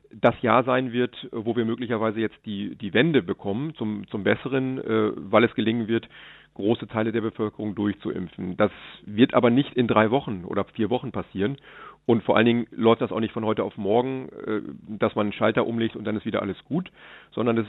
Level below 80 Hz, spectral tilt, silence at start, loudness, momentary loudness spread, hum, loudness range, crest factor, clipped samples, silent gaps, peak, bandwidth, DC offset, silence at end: -62 dBFS; -9.5 dB/octave; 0.15 s; -25 LUFS; 12 LU; none; 3 LU; 22 dB; under 0.1%; none; -2 dBFS; 4.1 kHz; under 0.1%; 0 s